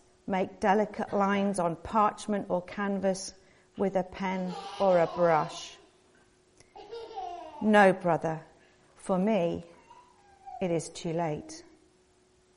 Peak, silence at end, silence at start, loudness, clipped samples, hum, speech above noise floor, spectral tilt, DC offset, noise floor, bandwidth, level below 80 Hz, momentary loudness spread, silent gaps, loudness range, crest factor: -10 dBFS; 0.95 s; 0.25 s; -29 LUFS; under 0.1%; none; 37 dB; -6 dB/octave; under 0.1%; -65 dBFS; 11 kHz; -64 dBFS; 17 LU; none; 5 LU; 22 dB